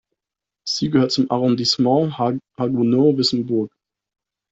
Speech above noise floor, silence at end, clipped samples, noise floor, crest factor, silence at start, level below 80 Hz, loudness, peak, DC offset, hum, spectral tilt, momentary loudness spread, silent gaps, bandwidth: 68 dB; 0.85 s; under 0.1%; -87 dBFS; 16 dB; 0.65 s; -60 dBFS; -19 LUFS; -4 dBFS; under 0.1%; none; -6 dB/octave; 8 LU; none; 8 kHz